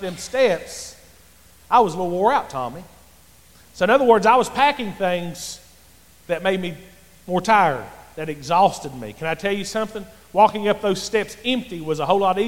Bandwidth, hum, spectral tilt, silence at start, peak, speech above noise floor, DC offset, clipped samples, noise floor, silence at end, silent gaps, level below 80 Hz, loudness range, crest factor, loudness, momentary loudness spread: 17 kHz; none; -4.5 dB/octave; 0 s; -2 dBFS; 31 dB; 0.4%; under 0.1%; -51 dBFS; 0 s; none; -52 dBFS; 4 LU; 18 dB; -20 LUFS; 16 LU